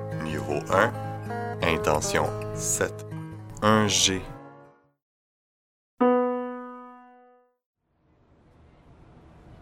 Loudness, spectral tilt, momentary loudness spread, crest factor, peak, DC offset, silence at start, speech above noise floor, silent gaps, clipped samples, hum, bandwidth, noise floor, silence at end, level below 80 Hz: -25 LUFS; -3.5 dB/octave; 18 LU; 24 dB; -4 dBFS; under 0.1%; 0 s; 41 dB; 5.02-5.97 s, 7.66-7.73 s; under 0.1%; none; 16.5 kHz; -65 dBFS; 0 s; -50 dBFS